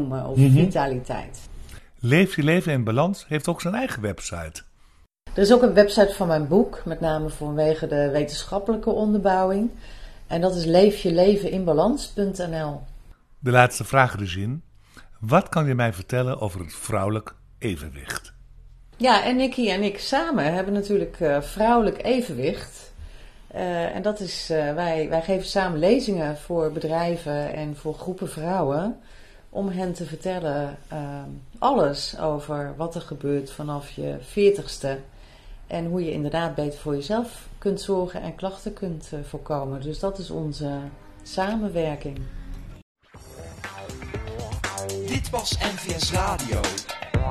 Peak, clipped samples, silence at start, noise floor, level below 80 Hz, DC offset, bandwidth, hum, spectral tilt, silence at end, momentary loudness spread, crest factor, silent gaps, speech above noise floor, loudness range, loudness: 0 dBFS; under 0.1%; 0 s; -55 dBFS; -42 dBFS; under 0.1%; 13.5 kHz; none; -6 dB/octave; 0 s; 16 LU; 24 dB; 42.82-42.95 s; 32 dB; 9 LU; -24 LUFS